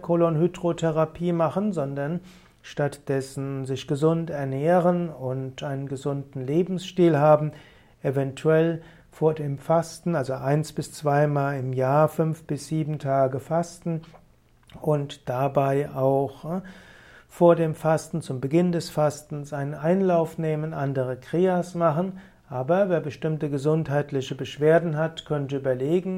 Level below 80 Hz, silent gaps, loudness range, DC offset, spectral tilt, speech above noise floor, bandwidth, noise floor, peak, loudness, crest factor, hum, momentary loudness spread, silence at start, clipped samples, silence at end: -58 dBFS; none; 3 LU; under 0.1%; -7.5 dB/octave; 33 dB; 15.5 kHz; -57 dBFS; -6 dBFS; -25 LUFS; 18 dB; none; 10 LU; 0 s; under 0.1%; 0 s